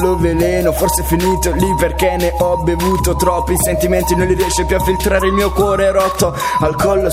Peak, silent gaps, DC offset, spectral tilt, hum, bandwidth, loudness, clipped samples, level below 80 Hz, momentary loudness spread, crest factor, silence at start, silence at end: 0 dBFS; none; under 0.1%; -5 dB/octave; none; 16 kHz; -14 LUFS; under 0.1%; -24 dBFS; 2 LU; 14 dB; 0 s; 0 s